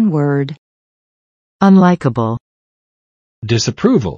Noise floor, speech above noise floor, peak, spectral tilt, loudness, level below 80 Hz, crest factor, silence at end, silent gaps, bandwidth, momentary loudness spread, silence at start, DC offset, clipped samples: under -90 dBFS; over 77 dB; 0 dBFS; -6.5 dB/octave; -14 LUFS; -50 dBFS; 16 dB; 0 s; 0.58-1.59 s, 2.40-3.42 s; 7.4 kHz; 15 LU; 0 s; under 0.1%; under 0.1%